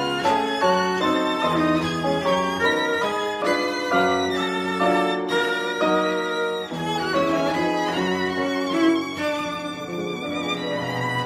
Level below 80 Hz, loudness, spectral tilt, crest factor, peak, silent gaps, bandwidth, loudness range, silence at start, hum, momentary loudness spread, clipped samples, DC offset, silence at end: -58 dBFS; -22 LUFS; -4.5 dB/octave; 16 dB; -6 dBFS; none; 15.5 kHz; 2 LU; 0 s; none; 6 LU; under 0.1%; under 0.1%; 0 s